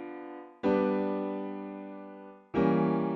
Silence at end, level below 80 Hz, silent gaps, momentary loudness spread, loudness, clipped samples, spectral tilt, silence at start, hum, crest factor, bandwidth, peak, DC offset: 0 s; -62 dBFS; none; 18 LU; -30 LUFS; under 0.1%; -7.5 dB/octave; 0 s; none; 18 dB; 6 kHz; -12 dBFS; under 0.1%